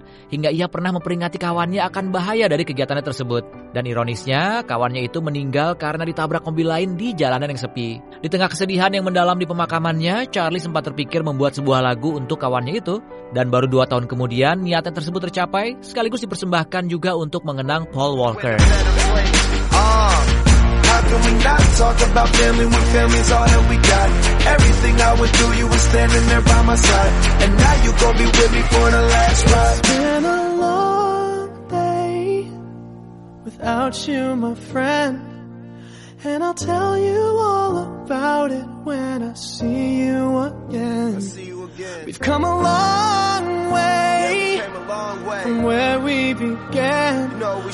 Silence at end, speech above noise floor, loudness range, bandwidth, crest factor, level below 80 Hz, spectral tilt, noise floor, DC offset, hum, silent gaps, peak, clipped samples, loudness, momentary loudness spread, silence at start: 0 s; 22 dB; 8 LU; 11.5 kHz; 16 dB; -22 dBFS; -4.5 dB/octave; -38 dBFS; under 0.1%; none; none; 0 dBFS; under 0.1%; -18 LUFS; 12 LU; 0.3 s